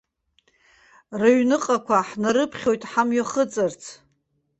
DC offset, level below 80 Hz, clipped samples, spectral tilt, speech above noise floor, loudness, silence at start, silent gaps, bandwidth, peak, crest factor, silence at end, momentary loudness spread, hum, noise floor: under 0.1%; -64 dBFS; under 0.1%; -4.5 dB/octave; 49 dB; -22 LUFS; 1.1 s; none; 8.4 kHz; -4 dBFS; 18 dB; 0.65 s; 8 LU; none; -70 dBFS